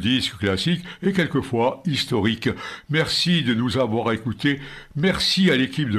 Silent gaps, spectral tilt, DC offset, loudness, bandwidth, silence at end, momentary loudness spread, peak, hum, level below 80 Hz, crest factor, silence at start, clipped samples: none; -5 dB/octave; under 0.1%; -21 LUFS; 13.5 kHz; 0 s; 6 LU; -4 dBFS; none; -50 dBFS; 18 dB; 0 s; under 0.1%